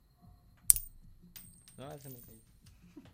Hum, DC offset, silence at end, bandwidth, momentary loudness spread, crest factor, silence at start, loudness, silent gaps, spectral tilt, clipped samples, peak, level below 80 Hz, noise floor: none; under 0.1%; 0.15 s; 16 kHz; 26 LU; 38 dB; 0.7 s; -26 LUFS; none; -1 dB/octave; under 0.1%; 0 dBFS; -56 dBFS; -61 dBFS